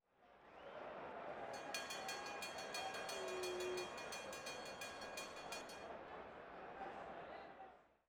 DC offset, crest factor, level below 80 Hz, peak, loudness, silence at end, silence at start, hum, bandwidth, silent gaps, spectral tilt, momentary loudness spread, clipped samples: under 0.1%; 20 dB; -78 dBFS; -30 dBFS; -49 LUFS; 0.15 s; 0.2 s; none; over 20 kHz; none; -2 dB/octave; 10 LU; under 0.1%